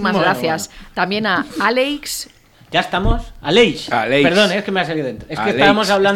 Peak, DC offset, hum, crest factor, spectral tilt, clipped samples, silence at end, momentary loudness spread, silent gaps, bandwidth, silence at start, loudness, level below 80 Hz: 0 dBFS; under 0.1%; none; 16 dB; -4.5 dB/octave; under 0.1%; 0 s; 11 LU; none; 17 kHz; 0 s; -16 LUFS; -32 dBFS